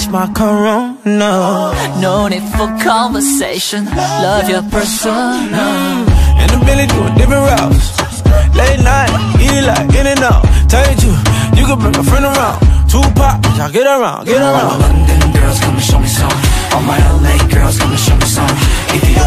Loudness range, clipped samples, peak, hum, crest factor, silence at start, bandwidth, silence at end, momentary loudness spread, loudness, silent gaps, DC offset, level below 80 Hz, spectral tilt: 3 LU; under 0.1%; 0 dBFS; none; 10 dB; 0 s; 15.5 kHz; 0 s; 4 LU; -11 LUFS; none; under 0.1%; -14 dBFS; -5 dB/octave